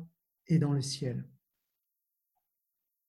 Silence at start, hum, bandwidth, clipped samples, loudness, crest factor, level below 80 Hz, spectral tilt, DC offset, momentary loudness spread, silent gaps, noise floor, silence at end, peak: 0 s; none; 12 kHz; under 0.1%; -32 LUFS; 20 dB; -70 dBFS; -6.5 dB/octave; under 0.1%; 13 LU; none; -84 dBFS; 1.8 s; -16 dBFS